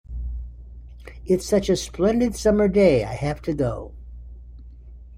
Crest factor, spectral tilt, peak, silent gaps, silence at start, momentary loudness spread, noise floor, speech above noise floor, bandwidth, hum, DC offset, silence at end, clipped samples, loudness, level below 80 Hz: 18 dB; -6 dB/octave; -6 dBFS; none; 0.1 s; 25 LU; -42 dBFS; 21 dB; 15.5 kHz; none; under 0.1%; 0 s; under 0.1%; -21 LUFS; -36 dBFS